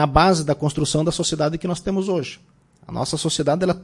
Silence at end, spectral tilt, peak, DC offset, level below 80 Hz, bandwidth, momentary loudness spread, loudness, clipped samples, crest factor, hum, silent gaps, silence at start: 0 s; -5 dB/octave; -2 dBFS; under 0.1%; -38 dBFS; 11.5 kHz; 9 LU; -21 LUFS; under 0.1%; 20 dB; none; none; 0 s